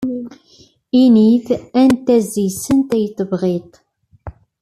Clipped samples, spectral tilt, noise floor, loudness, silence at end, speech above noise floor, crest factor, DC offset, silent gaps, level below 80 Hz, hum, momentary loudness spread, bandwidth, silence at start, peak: under 0.1%; -6.5 dB/octave; -50 dBFS; -15 LUFS; 0.3 s; 36 dB; 14 dB; under 0.1%; none; -50 dBFS; none; 13 LU; 14 kHz; 0 s; -2 dBFS